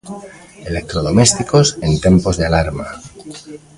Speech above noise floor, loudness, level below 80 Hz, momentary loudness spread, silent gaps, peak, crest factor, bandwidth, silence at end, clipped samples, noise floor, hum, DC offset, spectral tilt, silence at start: 19 dB; -14 LUFS; -30 dBFS; 22 LU; none; 0 dBFS; 16 dB; 11.5 kHz; 0.2 s; under 0.1%; -34 dBFS; none; under 0.1%; -5 dB/octave; 0.05 s